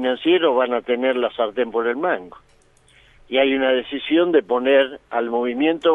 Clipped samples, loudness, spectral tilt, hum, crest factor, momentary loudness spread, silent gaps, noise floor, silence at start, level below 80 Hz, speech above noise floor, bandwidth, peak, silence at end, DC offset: under 0.1%; -20 LUFS; -6 dB/octave; none; 16 dB; 6 LU; none; -54 dBFS; 0 s; -60 dBFS; 35 dB; 4 kHz; -4 dBFS; 0 s; under 0.1%